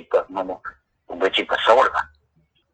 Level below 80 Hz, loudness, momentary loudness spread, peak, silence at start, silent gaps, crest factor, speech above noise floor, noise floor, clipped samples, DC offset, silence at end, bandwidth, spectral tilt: -58 dBFS; -20 LUFS; 22 LU; 0 dBFS; 0.1 s; none; 22 dB; 45 dB; -64 dBFS; under 0.1%; under 0.1%; 0.7 s; 8.8 kHz; -3 dB/octave